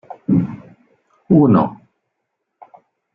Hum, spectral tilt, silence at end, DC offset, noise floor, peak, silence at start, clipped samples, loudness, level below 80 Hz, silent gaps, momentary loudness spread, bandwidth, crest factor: none; -12.5 dB/octave; 1.4 s; under 0.1%; -75 dBFS; -2 dBFS; 0.1 s; under 0.1%; -16 LUFS; -52 dBFS; none; 15 LU; 4.9 kHz; 18 dB